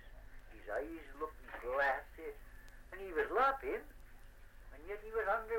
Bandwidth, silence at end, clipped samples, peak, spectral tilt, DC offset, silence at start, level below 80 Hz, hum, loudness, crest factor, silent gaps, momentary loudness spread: 16.5 kHz; 0 s; under 0.1%; -22 dBFS; -5 dB/octave; under 0.1%; 0 s; -56 dBFS; none; -39 LUFS; 20 dB; none; 25 LU